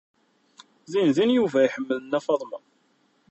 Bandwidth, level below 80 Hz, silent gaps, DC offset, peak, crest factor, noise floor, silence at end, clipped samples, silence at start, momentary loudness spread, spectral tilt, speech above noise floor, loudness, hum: 8.2 kHz; -72 dBFS; none; under 0.1%; -8 dBFS; 16 dB; -66 dBFS; 0.75 s; under 0.1%; 0.9 s; 10 LU; -6 dB/octave; 43 dB; -23 LUFS; none